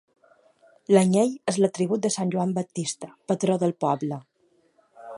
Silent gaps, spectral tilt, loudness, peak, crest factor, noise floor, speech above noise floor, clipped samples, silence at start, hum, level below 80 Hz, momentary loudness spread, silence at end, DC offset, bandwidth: none; -6 dB/octave; -24 LUFS; -6 dBFS; 20 dB; -65 dBFS; 41 dB; under 0.1%; 0.9 s; none; -72 dBFS; 12 LU; 0 s; under 0.1%; 11.5 kHz